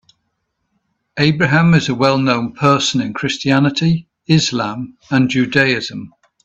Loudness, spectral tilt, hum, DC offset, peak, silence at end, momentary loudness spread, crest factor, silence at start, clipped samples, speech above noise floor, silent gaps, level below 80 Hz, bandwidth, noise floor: -15 LUFS; -5.5 dB/octave; none; under 0.1%; 0 dBFS; 0.35 s; 9 LU; 16 dB; 1.15 s; under 0.1%; 56 dB; none; -50 dBFS; 8 kHz; -70 dBFS